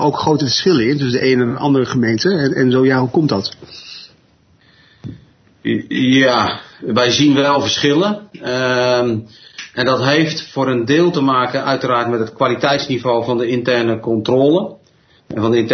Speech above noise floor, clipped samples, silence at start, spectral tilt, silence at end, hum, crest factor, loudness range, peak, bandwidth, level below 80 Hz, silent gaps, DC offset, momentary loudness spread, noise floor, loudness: 38 dB; under 0.1%; 0 s; -5.5 dB/octave; 0 s; none; 16 dB; 4 LU; 0 dBFS; 6.6 kHz; -54 dBFS; none; under 0.1%; 13 LU; -53 dBFS; -15 LUFS